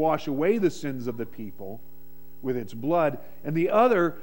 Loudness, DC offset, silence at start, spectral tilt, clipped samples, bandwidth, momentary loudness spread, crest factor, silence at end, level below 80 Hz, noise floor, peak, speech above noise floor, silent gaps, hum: -26 LUFS; 1%; 0 s; -7 dB/octave; under 0.1%; 16.5 kHz; 18 LU; 18 dB; 0 s; -62 dBFS; -52 dBFS; -10 dBFS; 27 dB; none; none